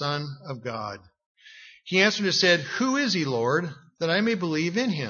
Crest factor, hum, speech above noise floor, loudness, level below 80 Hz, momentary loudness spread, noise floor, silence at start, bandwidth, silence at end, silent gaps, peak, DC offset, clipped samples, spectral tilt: 20 dB; none; 25 dB; -24 LUFS; -70 dBFS; 15 LU; -50 dBFS; 0 s; 7.2 kHz; 0 s; 1.26-1.35 s; -6 dBFS; under 0.1%; under 0.1%; -4 dB/octave